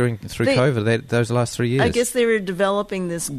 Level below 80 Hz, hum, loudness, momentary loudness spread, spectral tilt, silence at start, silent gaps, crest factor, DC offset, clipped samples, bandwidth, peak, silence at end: -46 dBFS; none; -20 LUFS; 5 LU; -5.5 dB/octave; 0 s; none; 16 dB; under 0.1%; under 0.1%; 13.5 kHz; -4 dBFS; 0 s